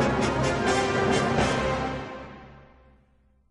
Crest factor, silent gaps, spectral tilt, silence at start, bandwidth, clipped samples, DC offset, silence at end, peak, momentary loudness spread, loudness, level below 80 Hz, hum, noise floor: 16 dB; none; -5 dB/octave; 0 s; 11.5 kHz; under 0.1%; under 0.1%; 0.9 s; -10 dBFS; 17 LU; -25 LUFS; -42 dBFS; none; -63 dBFS